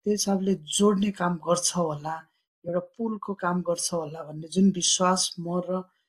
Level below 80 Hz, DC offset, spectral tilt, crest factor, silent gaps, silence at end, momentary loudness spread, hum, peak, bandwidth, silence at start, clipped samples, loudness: -66 dBFS; under 0.1%; -4 dB/octave; 18 dB; 2.48-2.62 s; 0.25 s; 11 LU; none; -8 dBFS; 14 kHz; 0.05 s; under 0.1%; -26 LUFS